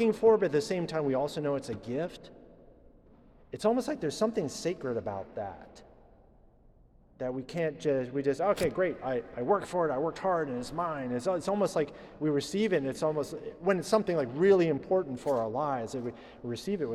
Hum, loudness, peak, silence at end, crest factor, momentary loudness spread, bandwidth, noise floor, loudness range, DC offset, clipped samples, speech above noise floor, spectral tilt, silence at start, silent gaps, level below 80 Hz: none; -31 LUFS; -12 dBFS; 0 s; 18 dB; 11 LU; 14 kHz; -60 dBFS; 7 LU; under 0.1%; under 0.1%; 30 dB; -6 dB/octave; 0 s; none; -60 dBFS